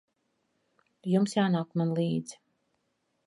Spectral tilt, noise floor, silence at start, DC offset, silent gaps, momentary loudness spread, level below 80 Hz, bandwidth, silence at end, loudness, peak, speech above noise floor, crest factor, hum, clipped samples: -6.5 dB/octave; -77 dBFS; 1.05 s; under 0.1%; none; 11 LU; -76 dBFS; 11.5 kHz; 0.9 s; -29 LUFS; -14 dBFS; 49 dB; 18 dB; none; under 0.1%